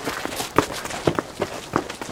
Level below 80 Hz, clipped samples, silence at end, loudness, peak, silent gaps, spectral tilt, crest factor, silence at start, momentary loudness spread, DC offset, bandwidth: -50 dBFS; under 0.1%; 0 s; -25 LUFS; 0 dBFS; none; -4 dB/octave; 26 dB; 0 s; 6 LU; under 0.1%; 18 kHz